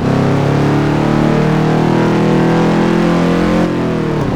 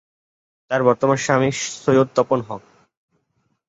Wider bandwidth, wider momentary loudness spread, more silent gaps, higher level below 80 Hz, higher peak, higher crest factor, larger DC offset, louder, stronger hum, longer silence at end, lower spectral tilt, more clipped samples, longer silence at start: first, 11.5 kHz vs 8 kHz; second, 2 LU vs 8 LU; neither; first, -32 dBFS vs -60 dBFS; about the same, -2 dBFS vs -2 dBFS; second, 10 dB vs 18 dB; neither; first, -12 LUFS vs -19 LUFS; neither; second, 0 s vs 1.1 s; first, -7.5 dB/octave vs -5 dB/octave; neither; second, 0 s vs 0.7 s